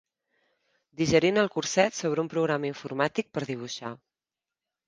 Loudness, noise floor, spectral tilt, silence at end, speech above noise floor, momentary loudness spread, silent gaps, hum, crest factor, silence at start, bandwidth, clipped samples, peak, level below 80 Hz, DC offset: -27 LUFS; under -90 dBFS; -4.5 dB/octave; 0.9 s; over 63 dB; 12 LU; none; none; 22 dB; 1 s; 10 kHz; under 0.1%; -6 dBFS; -62 dBFS; under 0.1%